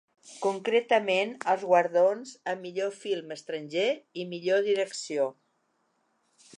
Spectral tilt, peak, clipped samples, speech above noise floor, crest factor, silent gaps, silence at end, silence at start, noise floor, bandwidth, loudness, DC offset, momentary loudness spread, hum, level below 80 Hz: -4 dB/octave; -10 dBFS; under 0.1%; 46 dB; 20 dB; none; 1.25 s; 0.25 s; -73 dBFS; 11 kHz; -28 LUFS; under 0.1%; 11 LU; none; -86 dBFS